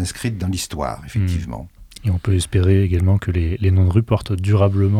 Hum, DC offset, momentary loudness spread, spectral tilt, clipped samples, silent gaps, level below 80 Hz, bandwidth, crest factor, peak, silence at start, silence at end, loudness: none; under 0.1%; 10 LU; -7 dB/octave; under 0.1%; none; -36 dBFS; 13.5 kHz; 16 dB; -2 dBFS; 0 s; 0 s; -19 LUFS